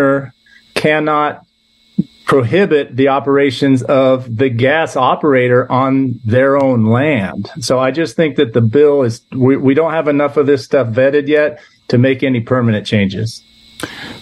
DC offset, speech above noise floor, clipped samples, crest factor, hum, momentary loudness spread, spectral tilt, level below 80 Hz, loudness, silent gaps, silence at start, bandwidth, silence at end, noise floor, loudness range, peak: under 0.1%; 40 dB; under 0.1%; 12 dB; none; 10 LU; -7 dB/octave; -52 dBFS; -13 LUFS; none; 0 s; 12.5 kHz; 0 s; -53 dBFS; 2 LU; 0 dBFS